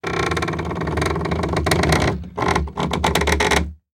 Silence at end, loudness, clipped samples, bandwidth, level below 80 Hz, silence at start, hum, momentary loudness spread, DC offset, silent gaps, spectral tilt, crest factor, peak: 0.2 s; -20 LUFS; under 0.1%; 17 kHz; -32 dBFS; 0.05 s; none; 6 LU; under 0.1%; none; -4.5 dB/octave; 20 dB; 0 dBFS